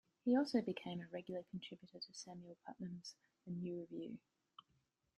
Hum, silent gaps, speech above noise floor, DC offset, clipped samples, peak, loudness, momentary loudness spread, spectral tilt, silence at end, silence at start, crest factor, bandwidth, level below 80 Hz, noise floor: none; none; 38 dB; under 0.1%; under 0.1%; -24 dBFS; -45 LUFS; 20 LU; -6 dB/octave; 1 s; 0.25 s; 20 dB; 11.5 kHz; -84 dBFS; -82 dBFS